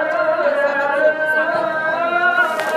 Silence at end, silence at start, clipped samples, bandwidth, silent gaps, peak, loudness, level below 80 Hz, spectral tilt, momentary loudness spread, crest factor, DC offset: 0 s; 0 s; under 0.1%; 15 kHz; none; -2 dBFS; -17 LUFS; -74 dBFS; -3.5 dB/octave; 3 LU; 14 dB; under 0.1%